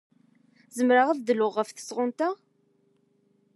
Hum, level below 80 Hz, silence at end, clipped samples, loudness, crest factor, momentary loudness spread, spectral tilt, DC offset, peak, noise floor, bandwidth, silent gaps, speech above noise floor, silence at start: none; under -90 dBFS; 1.2 s; under 0.1%; -26 LUFS; 20 dB; 12 LU; -4 dB/octave; under 0.1%; -8 dBFS; -68 dBFS; 12.5 kHz; none; 43 dB; 0.75 s